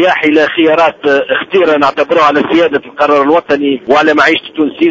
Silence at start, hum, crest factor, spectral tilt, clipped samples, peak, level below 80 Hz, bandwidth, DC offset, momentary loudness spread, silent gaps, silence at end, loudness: 0 s; none; 10 dB; -5 dB/octave; 0.6%; 0 dBFS; -52 dBFS; 8 kHz; under 0.1%; 4 LU; none; 0 s; -10 LUFS